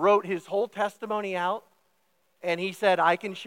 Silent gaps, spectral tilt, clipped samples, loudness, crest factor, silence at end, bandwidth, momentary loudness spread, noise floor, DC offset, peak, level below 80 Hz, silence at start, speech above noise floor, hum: none; -5 dB/octave; under 0.1%; -27 LUFS; 18 dB; 0 s; 16.5 kHz; 9 LU; -72 dBFS; under 0.1%; -8 dBFS; -88 dBFS; 0 s; 45 dB; none